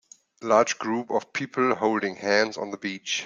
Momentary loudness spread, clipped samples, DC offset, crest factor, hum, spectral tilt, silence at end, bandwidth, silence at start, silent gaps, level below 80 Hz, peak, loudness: 10 LU; under 0.1%; under 0.1%; 20 dB; none; -3.5 dB/octave; 0 s; 9.4 kHz; 0.4 s; none; -72 dBFS; -4 dBFS; -25 LUFS